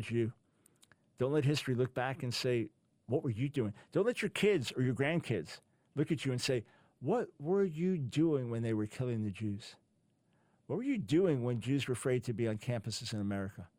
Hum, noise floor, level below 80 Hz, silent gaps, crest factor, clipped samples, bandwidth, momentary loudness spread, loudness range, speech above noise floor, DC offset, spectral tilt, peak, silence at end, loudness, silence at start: none; -75 dBFS; -70 dBFS; none; 16 dB; under 0.1%; 16 kHz; 8 LU; 2 LU; 40 dB; under 0.1%; -6 dB/octave; -20 dBFS; 0.15 s; -35 LUFS; 0 s